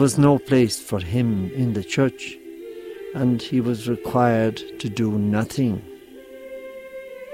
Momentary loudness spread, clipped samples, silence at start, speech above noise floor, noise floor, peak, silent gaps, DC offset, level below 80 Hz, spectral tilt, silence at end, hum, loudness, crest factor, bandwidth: 19 LU; under 0.1%; 0 s; 21 dB; -41 dBFS; -4 dBFS; none; under 0.1%; -52 dBFS; -6.5 dB/octave; 0 s; none; -22 LUFS; 18 dB; 16 kHz